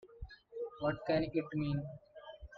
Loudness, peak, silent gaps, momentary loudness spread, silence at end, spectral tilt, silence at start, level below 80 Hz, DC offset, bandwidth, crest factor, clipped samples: -37 LUFS; -22 dBFS; none; 19 LU; 0 s; -6.5 dB/octave; 0.05 s; -58 dBFS; under 0.1%; 5.2 kHz; 16 dB; under 0.1%